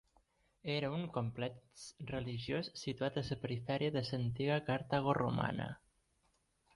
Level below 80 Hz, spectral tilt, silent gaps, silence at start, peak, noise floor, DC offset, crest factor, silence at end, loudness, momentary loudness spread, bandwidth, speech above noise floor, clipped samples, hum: -64 dBFS; -6.5 dB/octave; none; 0.65 s; -20 dBFS; -78 dBFS; under 0.1%; 20 dB; 1 s; -39 LUFS; 11 LU; 11.5 kHz; 39 dB; under 0.1%; none